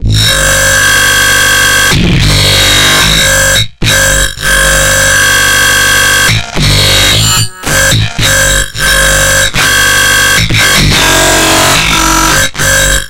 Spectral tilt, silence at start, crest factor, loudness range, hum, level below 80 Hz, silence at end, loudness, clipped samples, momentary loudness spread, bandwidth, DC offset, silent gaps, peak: -2 dB/octave; 0 s; 6 dB; 1 LU; none; -18 dBFS; 0 s; -5 LUFS; 0.4%; 4 LU; over 20 kHz; under 0.1%; none; 0 dBFS